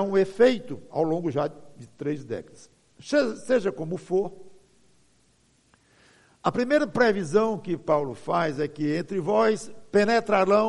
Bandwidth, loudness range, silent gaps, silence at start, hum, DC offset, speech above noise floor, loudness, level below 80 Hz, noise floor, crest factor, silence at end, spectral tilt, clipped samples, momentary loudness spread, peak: 11.5 kHz; 5 LU; none; 0 s; none; under 0.1%; 39 dB; -25 LUFS; -64 dBFS; -64 dBFS; 18 dB; 0 s; -6 dB/octave; under 0.1%; 11 LU; -6 dBFS